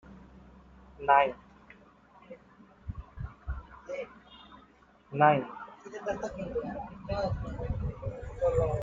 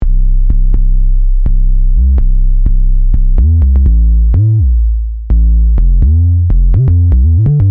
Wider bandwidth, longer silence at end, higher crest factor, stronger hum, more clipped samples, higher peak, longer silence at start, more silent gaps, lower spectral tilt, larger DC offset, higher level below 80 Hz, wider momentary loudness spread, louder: first, 7.8 kHz vs 1.2 kHz; about the same, 0 s vs 0 s; first, 24 dB vs 6 dB; neither; neither; second, -8 dBFS vs 0 dBFS; about the same, 0.05 s vs 0 s; neither; second, -7 dB/octave vs -13.5 dB/octave; neither; second, -46 dBFS vs -8 dBFS; first, 27 LU vs 5 LU; second, -31 LUFS vs -12 LUFS